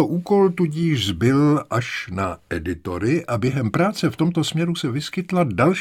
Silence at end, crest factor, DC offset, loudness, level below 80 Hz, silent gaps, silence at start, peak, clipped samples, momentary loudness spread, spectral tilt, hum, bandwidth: 0 s; 16 dB; under 0.1%; -21 LUFS; -48 dBFS; none; 0 s; -4 dBFS; under 0.1%; 9 LU; -6.5 dB/octave; none; 15.5 kHz